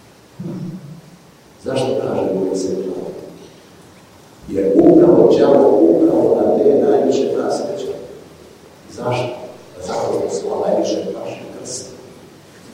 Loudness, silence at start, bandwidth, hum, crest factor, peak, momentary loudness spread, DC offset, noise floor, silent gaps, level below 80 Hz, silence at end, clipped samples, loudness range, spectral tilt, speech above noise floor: -15 LUFS; 0.4 s; 11.5 kHz; none; 16 dB; 0 dBFS; 21 LU; under 0.1%; -44 dBFS; none; -54 dBFS; 0 s; under 0.1%; 11 LU; -6.5 dB/octave; 29 dB